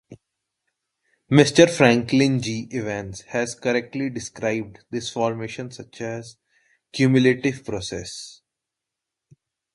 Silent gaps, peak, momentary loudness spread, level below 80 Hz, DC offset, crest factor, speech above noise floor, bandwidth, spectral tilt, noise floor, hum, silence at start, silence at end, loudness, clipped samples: none; 0 dBFS; 18 LU; -56 dBFS; under 0.1%; 24 dB; 63 dB; 11.5 kHz; -5.5 dB/octave; -85 dBFS; none; 0.1 s; 1.45 s; -22 LUFS; under 0.1%